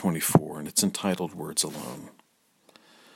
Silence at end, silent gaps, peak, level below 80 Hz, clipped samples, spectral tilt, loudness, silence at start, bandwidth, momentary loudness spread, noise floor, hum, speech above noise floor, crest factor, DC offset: 1.05 s; none; -2 dBFS; -66 dBFS; under 0.1%; -4 dB/octave; -26 LUFS; 0 s; 16.5 kHz; 15 LU; -64 dBFS; none; 37 dB; 28 dB; under 0.1%